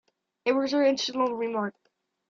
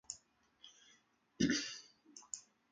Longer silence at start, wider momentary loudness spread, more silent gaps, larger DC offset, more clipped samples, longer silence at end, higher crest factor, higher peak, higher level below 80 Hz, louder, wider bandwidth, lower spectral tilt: first, 0.45 s vs 0.1 s; second, 8 LU vs 24 LU; neither; neither; neither; first, 0.6 s vs 0.3 s; second, 16 dB vs 24 dB; first, -12 dBFS vs -20 dBFS; second, -76 dBFS vs -70 dBFS; first, -27 LUFS vs -41 LUFS; second, 7.4 kHz vs 9.6 kHz; about the same, -4 dB/octave vs -3 dB/octave